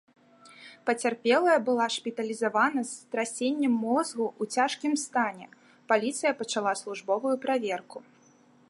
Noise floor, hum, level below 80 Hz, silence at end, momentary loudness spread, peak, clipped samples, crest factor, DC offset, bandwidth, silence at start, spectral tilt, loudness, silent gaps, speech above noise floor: -60 dBFS; none; -84 dBFS; 0.7 s; 9 LU; -10 dBFS; under 0.1%; 20 dB; under 0.1%; 11.5 kHz; 0.45 s; -3 dB/octave; -28 LUFS; none; 32 dB